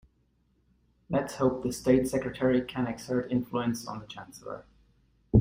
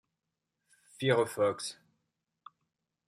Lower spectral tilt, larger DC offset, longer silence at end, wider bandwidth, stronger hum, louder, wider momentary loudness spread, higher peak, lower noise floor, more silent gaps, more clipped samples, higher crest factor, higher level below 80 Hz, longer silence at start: first, -6.5 dB/octave vs -4.5 dB/octave; neither; second, 0 s vs 1.35 s; about the same, 16 kHz vs 15.5 kHz; neither; about the same, -29 LUFS vs -31 LUFS; first, 17 LU vs 12 LU; first, -8 dBFS vs -14 dBFS; second, -70 dBFS vs -87 dBFS; neither; neither; about the same, 22 dB vs 22 dB; first, -52 dBFS vs -80 dBFS; about the same, 1.1 s vs 1 s